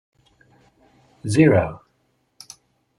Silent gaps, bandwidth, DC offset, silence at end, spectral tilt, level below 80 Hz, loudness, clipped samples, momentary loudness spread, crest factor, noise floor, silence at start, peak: none; 11.5 kHz; under 0.1%; 1.2 s; -7 dB/octave; -54 dBFS; -18 LUFS; under 0.1%; 27 LU; 22 dB; -67 dBFS; 1.25 s; -2 dBFS